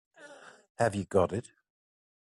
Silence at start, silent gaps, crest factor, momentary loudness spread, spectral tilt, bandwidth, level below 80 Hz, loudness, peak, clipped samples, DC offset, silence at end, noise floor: 0.2 s; 0.70-0.75 s; 22 dB; 23 LU; -6.5 dB/octave; 12 kHz; -68 dBFS; -30 LUFS; -12 dBFS; under 0.1%; under 0.1%; 1 s; -53 dBFS